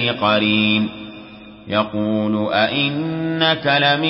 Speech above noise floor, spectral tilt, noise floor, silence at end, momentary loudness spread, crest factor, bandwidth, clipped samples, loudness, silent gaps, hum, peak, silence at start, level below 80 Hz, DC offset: 21 dB; -10 dB/octave; -38 dBFS; 0 s; 9 LU; 16 dB; 5.8 kHz; under 0.1%; -18 LUFS; none; none; -4 dBFS; 0 s; -54 dBFS; under 0.1%